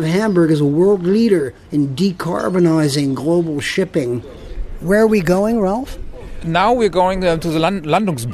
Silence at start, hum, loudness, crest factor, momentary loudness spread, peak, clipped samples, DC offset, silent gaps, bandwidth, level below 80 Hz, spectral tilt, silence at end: 0 s; none; -16 LUFS; 14 dB; 12 LU; -2 dBFS; under 0.1%; under 0.1%; none; 13 kHz; -34 dBFS; -6.5 dB/octave; 0 s